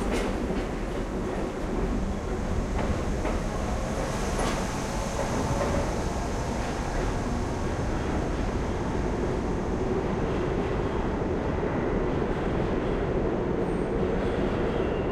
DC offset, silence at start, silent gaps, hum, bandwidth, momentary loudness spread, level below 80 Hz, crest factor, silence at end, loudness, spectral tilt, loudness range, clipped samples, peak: under 0.1%; 0 s; none; none; 13.5 kHz; 3 LU; -34 dBFS; 14 dB; 0 s; -29 LUFS; -6.5 dB/octave; 2 LU; under 0.1%; -14 dBFS